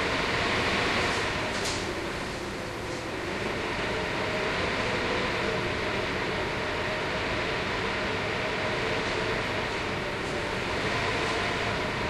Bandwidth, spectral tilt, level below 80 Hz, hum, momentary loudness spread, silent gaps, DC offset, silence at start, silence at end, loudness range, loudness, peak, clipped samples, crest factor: 14.5 kHz; -4 dB/octave; -46 dBFS; none; 6 LU; none; under 0.1%; 0 s; 0 s; 2 LU; -28 LUFS; -14 dBFS; under 0.1%; 14 dB